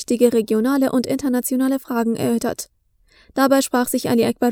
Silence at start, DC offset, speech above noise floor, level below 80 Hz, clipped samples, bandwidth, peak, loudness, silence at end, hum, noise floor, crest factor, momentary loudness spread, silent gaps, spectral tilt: 0 s; under 0.1%; 38 dB; -56 dBFS; under 0.1%; over 20 kHz; -2 dBFS; -19 LUFS; 0 s; none; -56 dBFS; 18 dB; 7 LU; none; -4.5 dB/octave